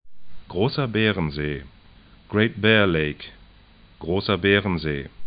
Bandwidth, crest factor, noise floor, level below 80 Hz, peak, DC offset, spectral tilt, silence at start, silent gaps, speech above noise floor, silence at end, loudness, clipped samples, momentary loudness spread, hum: 5.2 kHz; 20 dB; -51 dBFS; -44 dBFS; -4 dBFS; under 0.1%; -10.5 dB/octave; 0.05 s; none; 29 dB; 0 s; -22 LUFS; under 0.1%; 16 LU; none